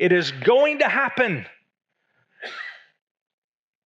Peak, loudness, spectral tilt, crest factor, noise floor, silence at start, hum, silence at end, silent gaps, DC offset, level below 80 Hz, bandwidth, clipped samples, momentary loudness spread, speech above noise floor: -4 dBFS; -20 LUFS; -5.5 dB/octave; 20 dB; -69 dBFS; 0 s; none; 1.15 s; none; under 0.1%; -88 dBFS; 8 kHz; under 0.1%; 19 LU; 49 dB